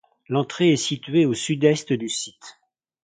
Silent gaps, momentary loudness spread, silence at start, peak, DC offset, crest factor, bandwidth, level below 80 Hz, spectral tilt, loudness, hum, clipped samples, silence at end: none; 8 LU; 0.3 s; -4 dBFS; under 0.1%; 18 dB; 9.6 kHz; -64 dBFS; -5 dB/octave; -22 LUFS; none; under 0.1%; 0.55 s